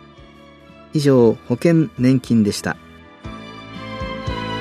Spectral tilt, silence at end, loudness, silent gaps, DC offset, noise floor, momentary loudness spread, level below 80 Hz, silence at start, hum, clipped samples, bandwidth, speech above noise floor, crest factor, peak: -6.5 dB/octave; 0 s; -18 LUFS; none; under 0.1%; -44 dBFS; 20 LU; -42 dBFS; 0.95 s; none; under 0.1%; 14 kHz; 28 dB; 18 dB; -2 dBFS